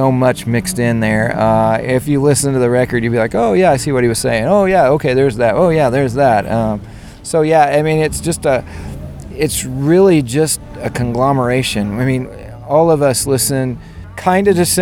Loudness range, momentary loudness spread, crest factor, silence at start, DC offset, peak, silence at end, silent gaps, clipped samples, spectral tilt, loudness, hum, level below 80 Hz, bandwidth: 3 LU; 9 LU; 14 dB; 0 s; under 0.1%; 0 dBFS; 0 s; none; under 0.1%; -5.5 dB/octave; -14 LUFS; none; -36 dBFS; 19.5 kHz